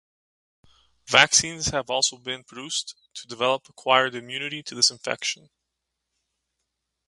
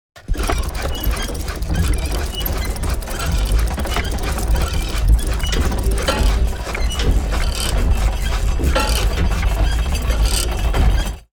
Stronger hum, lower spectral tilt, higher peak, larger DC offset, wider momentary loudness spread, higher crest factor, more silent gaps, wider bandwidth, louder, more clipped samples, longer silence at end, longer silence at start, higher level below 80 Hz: neither; second, -0.5 dB/octave vs -4.5 dB/octave; first, 0 dBFS vs -4 dBFS; neither; first, 16 LU vs 5 LU; first, 26 dB vs 14 dB; neither; second, 11.5 kHz vs over 20 kHz; second, -23 LUFS vs -20 LUFS; neither; first, 1.7 s vs 0.15 s; first, 1.1 s vs 0.15 s; second, -58 dBFS vs -18 dBFS